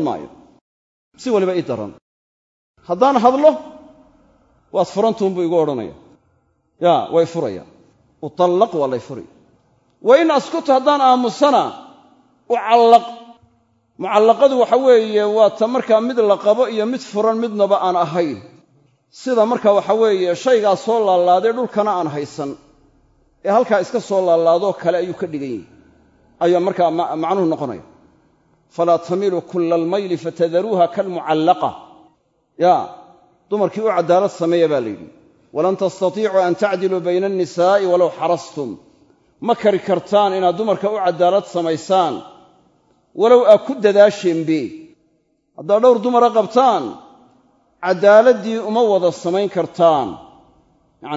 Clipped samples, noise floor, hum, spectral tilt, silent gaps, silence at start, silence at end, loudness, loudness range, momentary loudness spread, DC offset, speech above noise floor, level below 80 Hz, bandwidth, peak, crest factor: under 0.1%; -63 dBFS; none; -6 dB/octave; 0.61-1.11 s, 2.02-2.74 s; 0 s; 0 s; -16 LUFS; 5 LU; 14 LU; under 0.1%; 47 dB; -64 dBFS; 7.8 kHz; 0 dBFS; 16 dB